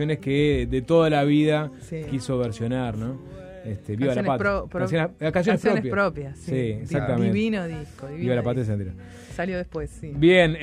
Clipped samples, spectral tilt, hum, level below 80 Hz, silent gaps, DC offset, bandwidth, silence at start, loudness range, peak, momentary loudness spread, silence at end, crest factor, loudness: under 0.1%; -7 dB/octave; none; -44 dBFS; none; under 0.1%; 12 kHz; 0 s; 3 LU; -6 dBFS; 15 LU; 0 s; 18 dB; -24 LUFS